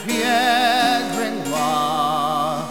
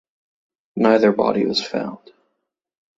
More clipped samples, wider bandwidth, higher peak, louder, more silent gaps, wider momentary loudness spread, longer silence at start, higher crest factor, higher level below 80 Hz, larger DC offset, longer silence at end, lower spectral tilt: neither; first, 16 kHz vs 7.8 kHz; second, -6 dBFS vs -2 dBFS; about the same, -19 LUFS vs -18 LUFS; neither; second, 7 LU vs 15 LU; second, 0 s vs 0.75 s; second, 14 dB vs 20 dB; about the same, -60 dBFS vs -64 dBFS; first, 0.6% vs under 0.1%; second, 0 s vs 1 s; second, -3 dB/octave vs -5.5 dB/octave